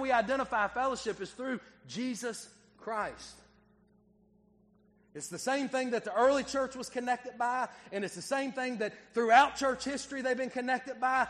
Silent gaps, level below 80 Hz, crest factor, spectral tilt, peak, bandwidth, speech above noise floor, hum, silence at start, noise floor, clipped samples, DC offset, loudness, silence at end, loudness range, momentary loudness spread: none; -66 dBFS; 26 dB; -3 dB/octave; -8 dBFS; 12.5 kHz; 34 dB; 60 Hz at -70 dBFS; 0 s; -66 dBFS; under 0.1%; under 0.1%; -32 LUFS; 0 s; 11 LU; 13 LU